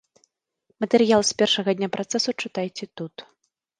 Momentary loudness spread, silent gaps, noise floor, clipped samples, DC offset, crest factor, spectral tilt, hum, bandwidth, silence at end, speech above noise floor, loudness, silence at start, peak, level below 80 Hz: 17 LU; none; -70 dBFS; under 0.1%; under 0.1%; 22 dB; -3.5 dB/octave; none; 10 kHz; 0.55 s; 47 dB; -22 LUFS; 0.8 s; -4 dBFS; -66 dBFS